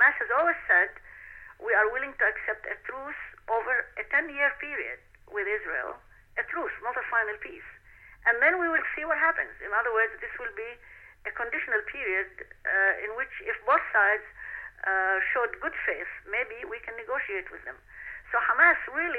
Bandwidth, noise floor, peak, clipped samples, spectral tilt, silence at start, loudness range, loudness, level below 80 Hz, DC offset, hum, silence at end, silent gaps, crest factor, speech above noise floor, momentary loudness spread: 4.5 kHz; -53 dBFS; -8 dBFS; under 0.1%; -5.5 dB/octave; 0 s; 4 LU; -27 LUFS; -58 dBFS; under 0.1%; none; 0 s; none; 20 dB; 24 dB; 17 LU